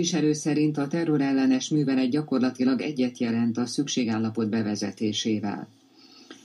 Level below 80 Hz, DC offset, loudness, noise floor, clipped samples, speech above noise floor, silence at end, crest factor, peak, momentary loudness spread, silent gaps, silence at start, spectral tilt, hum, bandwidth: -76 dBFS; under 0.1%; -25 LUFS; -53 dBFS; under 0.1%; 28 dB; 0.1 s; 12 dB; -12 dBFS; 5 LU; none; 0 s; -5 dB/octave; none; 11.5 kHz